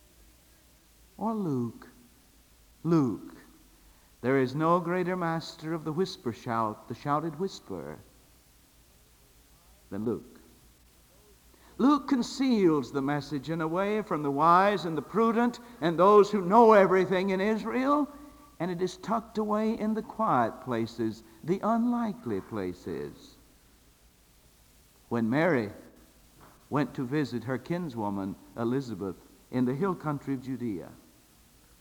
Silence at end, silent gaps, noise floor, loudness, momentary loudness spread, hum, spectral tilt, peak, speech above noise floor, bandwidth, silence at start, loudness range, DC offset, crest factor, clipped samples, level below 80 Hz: 0.85 s; none; -61 dBFS; -28 LUFS; 15 LU; none; -7 dB/octave; -6 dBFS; 33 dB; over 20 kHz; 1.2 s; 13 LU; under 0.1%; 24 dB; under 0.1%; -62 dBFS